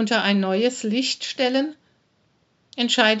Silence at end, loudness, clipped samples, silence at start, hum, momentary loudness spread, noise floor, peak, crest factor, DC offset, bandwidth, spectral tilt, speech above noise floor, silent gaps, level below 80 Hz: 0 s; -21 LUFS; under 0.1%; 0 s; none; 8 LU; -65 dBFS; 0 dBFS; 22 dB; under 0.1%; 8 kHz; -2 dB/octave; 44 dB; none; -80 dBFS